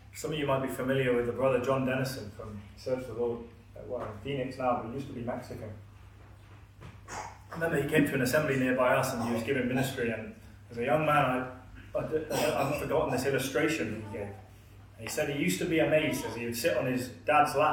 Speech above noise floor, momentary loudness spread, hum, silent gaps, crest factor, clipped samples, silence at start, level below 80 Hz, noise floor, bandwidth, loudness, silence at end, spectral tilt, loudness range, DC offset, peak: 22 dB; 17 LU; none; none; 20 dB; under 0.1%; 0.15 s; -56 dBFS; -52 dBFS; 18 kHz; -30 LUFS; 0 s; -5.5 dB/octave; 8 LU; under 0.1%; -12 dBFS